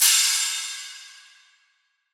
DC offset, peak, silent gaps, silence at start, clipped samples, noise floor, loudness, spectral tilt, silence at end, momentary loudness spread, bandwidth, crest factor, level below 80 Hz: under 0.1%; -4 dBFS; none; 0 s; under 0.1%; -69 dBFS; -20 LUFS; 14 dB/octave; 1 s; 22 LU; over 20 kHz; 20 dB; under -90 dBFS